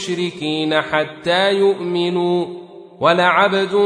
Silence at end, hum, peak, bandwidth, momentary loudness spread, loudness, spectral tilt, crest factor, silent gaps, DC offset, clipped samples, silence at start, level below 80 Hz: 0 s; none; -2 dBFS; 10.5 kHz; 8 LU; -17 LUFS; -5 dB/octave; 16 dB; none; under 0.1%; under 0.1%; 0 s; -62 dBFS